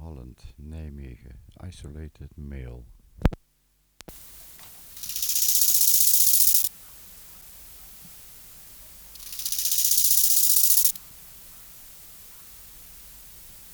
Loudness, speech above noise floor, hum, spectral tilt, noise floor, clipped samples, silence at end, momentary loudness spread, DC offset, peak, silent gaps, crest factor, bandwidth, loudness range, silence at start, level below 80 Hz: -18 LUFS; 26 dB; none; -1 dB/octave; -67 dBFS; under 0.1%; 0.15 s; 28 LU; under 0.1%; -2 dBFS; none; 24 dB; over 20 kHz; 18 LU; 0 s; -44 dBFS